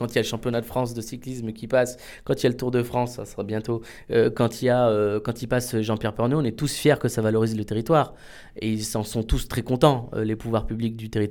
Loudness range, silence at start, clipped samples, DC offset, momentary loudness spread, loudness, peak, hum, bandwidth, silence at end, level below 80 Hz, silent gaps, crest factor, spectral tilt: 3 LU; 0 s; under 0.1%; under 0.1%; 10 LU; -24 LUFS; -2 dBFS; none; 19 kHz; 0 s; -40 dBFS; none; 22 dB; -6 dB/octave